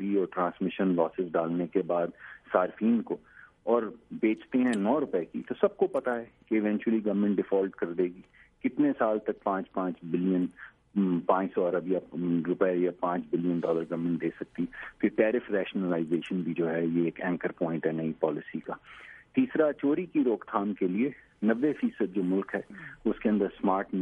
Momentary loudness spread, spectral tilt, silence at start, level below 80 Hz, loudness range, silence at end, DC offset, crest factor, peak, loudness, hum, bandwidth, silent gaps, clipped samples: 9 LU; -8.5 dB/octave; 0 s; -68 dBFS; 2 LU; 0 s; under 0.1%; 20 dB; -8 dBFS; -29 LUFS; none; 9.6 kHz; none; under 0.1%